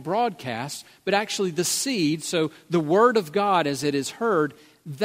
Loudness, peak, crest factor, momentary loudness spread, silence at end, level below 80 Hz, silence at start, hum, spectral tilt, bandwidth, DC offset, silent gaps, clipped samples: -24 LUFS; -6 dBFS; 18 dB; 12 LU; 0 s; -70 dBFS; 0 s; none; -4 dB/octave; 16 kHz; under 0.1%; none; under 0.1%